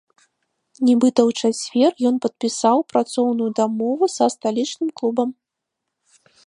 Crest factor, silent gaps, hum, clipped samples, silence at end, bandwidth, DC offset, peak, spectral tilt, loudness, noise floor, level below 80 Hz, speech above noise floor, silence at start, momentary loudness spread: 18 dB; none; none; under 0.1%; 1.15 s; 11 kHz; under 0.1%; -2 dBFS; -4.5 dB/octave; -20 LUFS; -81 dBFS; -74 dBFS; 62 dB; 0.8 s; 7 LU